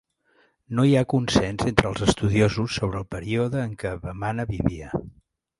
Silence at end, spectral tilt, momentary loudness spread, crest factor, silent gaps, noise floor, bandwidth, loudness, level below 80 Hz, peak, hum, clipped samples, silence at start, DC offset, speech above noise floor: 0.5 s; -6 dB/octave; 11 LU; 24 dB; none; -63 dBFS; 11.5 kHz; -24 LUFS; -42 dBFS; 0 dBFS; none; under 0.1%; 0.7 s; under 0.1%; 40 dB